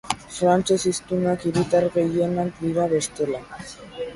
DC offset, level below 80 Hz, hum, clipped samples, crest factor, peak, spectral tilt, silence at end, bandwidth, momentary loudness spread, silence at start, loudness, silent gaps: under 0.1%; -52 dBFS; none; under 0.1%; 18 dB; -4 dBFS; -5.5 dB/octave; 0 s; 11.5 kHz; 13 LU; 0.05 s; -22 LUFS; none